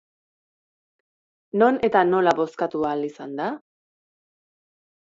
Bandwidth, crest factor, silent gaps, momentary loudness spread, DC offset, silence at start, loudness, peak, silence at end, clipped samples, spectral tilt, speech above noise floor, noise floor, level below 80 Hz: 7.8 kHz; 22 dB; none; 12 LU; under 0.1%; 1.55 s; -22 LUFS; -4 dBFS; 1.55 s; under 0.1%; -6.5 dB/octave; over 69 dB; under -90 dBFS; -66 dBFS